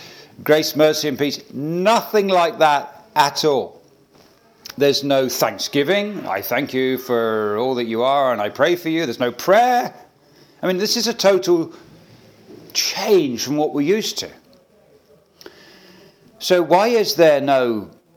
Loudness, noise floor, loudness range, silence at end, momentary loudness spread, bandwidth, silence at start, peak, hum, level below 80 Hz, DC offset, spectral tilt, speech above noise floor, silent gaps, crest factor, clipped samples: -18 LUFS; -53 dBFS; 3 LU; 0.3 s; 10 LU; 19.5 kHz; 0 s; 0 dBFS; none; -70 dBFS; under 0.1%; -4 dB/octave; 35 dB; none; 18 dB; under 0.1%